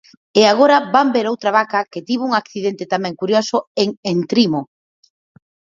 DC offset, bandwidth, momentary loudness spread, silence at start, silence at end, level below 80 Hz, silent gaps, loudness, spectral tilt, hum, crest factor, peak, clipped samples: under 0.1%; 7.6 kHz; 9 LU; 0.35 s; 1.1 s; -66 dBFS; 3.67-3.75 s, 3.97-4.03 s; -17 LUFS; -5 dB/octave; none; 18 dB; 0 dBFS; under 0.1%